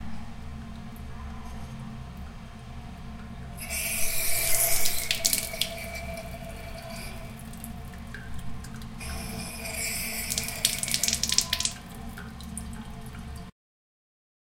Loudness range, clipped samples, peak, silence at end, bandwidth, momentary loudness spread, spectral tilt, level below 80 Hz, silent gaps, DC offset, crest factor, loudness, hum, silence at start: 13 LU; under 0.1%; -2 dBFS; 1 s; 17 kHz; 18 LU; -1.5 dB/octave; -42 dBFS; none; under 0.1%; 28 dB; -28 LUFS; none; 0 s